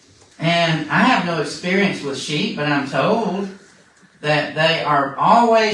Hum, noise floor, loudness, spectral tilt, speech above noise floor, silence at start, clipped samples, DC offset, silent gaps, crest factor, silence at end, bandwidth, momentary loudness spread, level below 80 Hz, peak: none; -51 dBFS; -18 LUFS; -5 dB/octave; 33 dB; 0.4 s; under 0.1%; under 0.1%; none; 18 dB; 0 s; 11.5 kHz; 9 LU; -62 dBFS; 0 dBFS